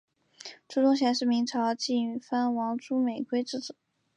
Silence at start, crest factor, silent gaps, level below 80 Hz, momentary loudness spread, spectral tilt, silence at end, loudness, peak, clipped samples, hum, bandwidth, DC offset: 0.45 s; 16 dB; none; -82 dBFS; 15 LU; -4 dB/octave; 0.45 s; -28 LUFS; -14 dBFS; under 0.1%; none; 9.4 kHz; under 0.1%